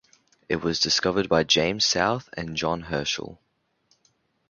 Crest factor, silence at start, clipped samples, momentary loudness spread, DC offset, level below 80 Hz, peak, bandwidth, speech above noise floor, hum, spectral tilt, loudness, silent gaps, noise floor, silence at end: 22 dB; 0.5 s; under 0.1%; 11 LU; under 0.1%; -52 dBFS; -4 dBFS; 7.4 kHz; 44 dB; none; -3 dB/octave; -24 LUFS; none; -68 dBFS; 1.15 s